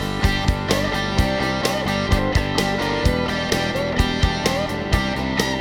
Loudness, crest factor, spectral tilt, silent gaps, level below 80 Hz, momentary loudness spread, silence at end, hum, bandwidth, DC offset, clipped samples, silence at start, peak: -21 LUFS; 18 dB; -5 dB/octave; none; -28 dBFS; 2 LU; 0 s; none; over 20 kHz; under 0.1%; under 0.1%; 0 s; -2 dBFS